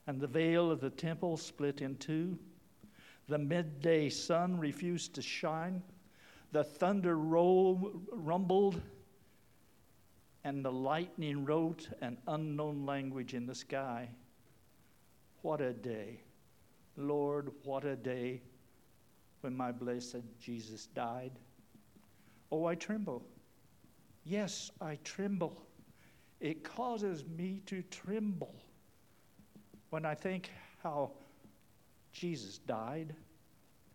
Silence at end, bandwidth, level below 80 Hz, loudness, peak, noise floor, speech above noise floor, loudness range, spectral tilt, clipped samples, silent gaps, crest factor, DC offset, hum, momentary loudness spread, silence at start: 0.7 s; 17.5 kHz; -76 dBFS; -38 LUFS; -18 dBFS; -68 dBFS; 31 dB; 10 LU; -6 dB/octave; under 0.1%; none; 20 dB; under 0.1%; none; 14 LU; 0.05 s